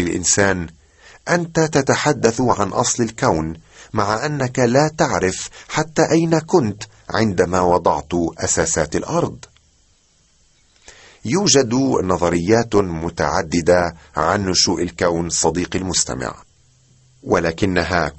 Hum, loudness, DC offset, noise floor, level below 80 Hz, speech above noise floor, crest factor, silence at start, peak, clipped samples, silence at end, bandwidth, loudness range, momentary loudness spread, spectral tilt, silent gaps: none; -18 LUFS; under 0.1%; -57 dBFS; -42 dBFS; 39 dB; 18 dB; 0 s; -2 dBFS; under 0.1%; 0.05 s; 8.6 kHz; 3 LU; 8 LU; -4 dB/octave; none